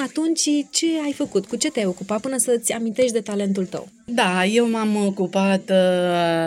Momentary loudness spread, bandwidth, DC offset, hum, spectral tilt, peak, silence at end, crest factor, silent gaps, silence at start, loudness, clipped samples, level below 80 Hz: 6 LU; 16 kHz; under 0.1%; none; -4 dB/octave; -6 dBFS; 0 s; 16 dB; none; 0 s; -21 LUFS; under 0.1%; -64 dBFS